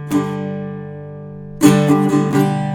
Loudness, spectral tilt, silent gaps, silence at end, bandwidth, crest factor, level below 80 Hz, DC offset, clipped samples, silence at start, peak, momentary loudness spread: -16 LUFS; -6.5 dB/octave; none; 0 s; 19 kHz; 16 dB; -50 dBFS; under 0.1%; under 0.1%; 0 s; 0 dBFS; 19 LU